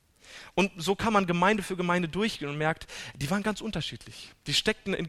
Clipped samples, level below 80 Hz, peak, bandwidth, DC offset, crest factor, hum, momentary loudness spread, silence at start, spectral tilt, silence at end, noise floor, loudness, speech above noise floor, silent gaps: under 0.1%; -52 dBFS; -8 dBFS; 13.5 kHz; under 0.1%; 20 dB; none; 16 LU; 0.25 s; -4.5 dB/octave; 0 s; -50 dBFS; -28 LUFS; 21 dB; none